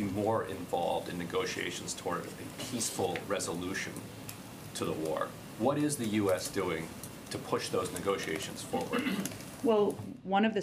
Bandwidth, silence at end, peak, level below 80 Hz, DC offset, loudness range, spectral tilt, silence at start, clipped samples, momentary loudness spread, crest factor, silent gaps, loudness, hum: 15.5 kHz; 0 s; -16 dBFS; -66 dBFS; under 0.1%; 3 LU; -4.5 dB/octave; 0 s; under 0.1%; 11 LU; 18 dB; none; -34 LUFS; none